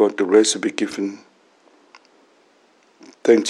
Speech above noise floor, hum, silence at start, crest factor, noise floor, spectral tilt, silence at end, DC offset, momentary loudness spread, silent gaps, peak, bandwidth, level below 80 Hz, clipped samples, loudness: 38 dB; none; 0 s; 20 dB; -57 dBFS; -3 dB/octave; 0 s; under 0.1%; 13 LU; none; -2 dBFS; 12 kHz; -78 dBFS; under 0.1%; -19 LUFS